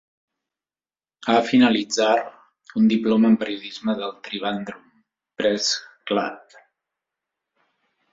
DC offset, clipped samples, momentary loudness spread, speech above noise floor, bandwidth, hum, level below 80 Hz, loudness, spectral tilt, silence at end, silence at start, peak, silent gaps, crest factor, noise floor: under 0.1%; under 0.1%; 14 LU; over 69 dB; 7.8 kHz; none; -66 dBFS; -21 LUFS; -4.5 dB/octave; 1.75 s; 1.25 s; -6 dBFS; none; 18 dB; under -90 dBFS